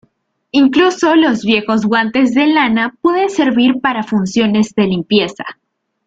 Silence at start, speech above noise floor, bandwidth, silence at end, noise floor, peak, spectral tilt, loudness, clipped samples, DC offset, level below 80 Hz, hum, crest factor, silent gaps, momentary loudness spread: 0.55 s; 46 dB; 8 kHz; 0.55 s; -59 dBFS; -2 dBFS; -5 dB/octave; -13 LUFS; under 0.1%; under 0.1%; -54 dBFS; none; 12 dB; none; 5 LU